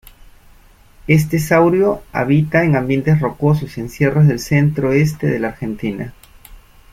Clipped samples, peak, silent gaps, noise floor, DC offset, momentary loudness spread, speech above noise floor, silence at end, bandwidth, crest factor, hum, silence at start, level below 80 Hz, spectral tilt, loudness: under 0.1%; -2 dBFS; none; -46 dBFS; under 0.1%; 10 LU; 31 dB; 0.4 s; 15.5 kHz; 16 dB; none; 1.05 s; -42 dBFS; -7.5 dB/octave; -16 LUFS